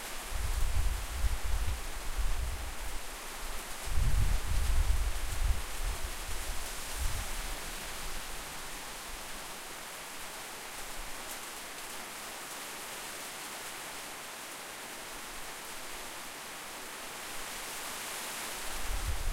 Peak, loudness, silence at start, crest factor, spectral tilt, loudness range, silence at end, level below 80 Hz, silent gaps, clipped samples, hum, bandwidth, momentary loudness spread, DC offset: -16 dBFS; -38 LUFS; 0 s; 18 dB; -2.5 dB/octave; 5 LU; 0 s; -38 dBFS; none; under 0.1%; none; 16 kHz; 7 LU; under 0.1%